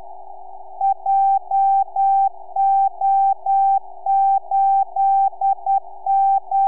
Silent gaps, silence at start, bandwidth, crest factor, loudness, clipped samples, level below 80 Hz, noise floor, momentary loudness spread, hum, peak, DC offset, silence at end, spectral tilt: none; 0 s; 2.5 kHz; 6 dB; -18 LUFS; under 0.1%; -76 dBFS; -38 dBFS; 5 LU; none; -12 dBFS; 2%; 0 s; -7.5 dB/octave